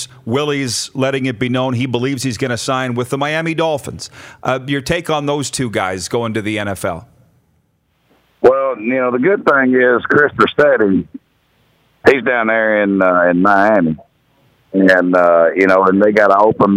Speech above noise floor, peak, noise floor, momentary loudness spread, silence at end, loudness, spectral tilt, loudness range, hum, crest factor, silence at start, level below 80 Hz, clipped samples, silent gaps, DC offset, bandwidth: 47 dB; 0 dBFS; -61 dBFS; 9 LU; 0 s; -14 LUFS; -5 dB/octave; 7 LU; none; 14 dB; 0 s; -52 dBFS; under 0.1%; none; under 0.1%; 16 kHz